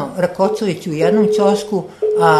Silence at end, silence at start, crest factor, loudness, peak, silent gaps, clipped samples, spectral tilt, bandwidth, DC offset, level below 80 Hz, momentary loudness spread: 0 s; 0 s; 16 dB; -16 LUFS; 0 dBFS; none; under 0.1%; -6 dB/octave; 13.5 kHz; under 0.1%; -56 dBFS; 7 LU